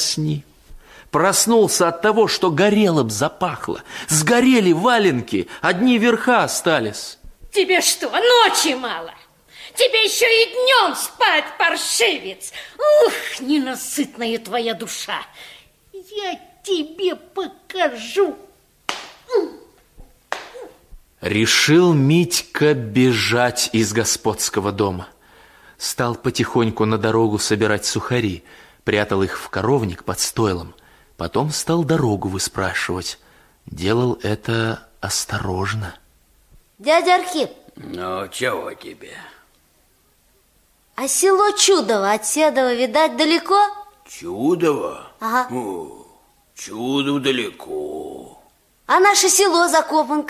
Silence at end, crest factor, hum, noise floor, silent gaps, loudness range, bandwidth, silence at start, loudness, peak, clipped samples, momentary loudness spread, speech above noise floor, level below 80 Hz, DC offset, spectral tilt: 0 s; 18 dB; none; -58 dBFS; none; 9 LU; 16 kHz; 0 s; -18 LUFS; -2 dBFS; under 0.1%; 16 LU; 40 dB; -48 dBFS; under 0.1%; -3.5 dB/octave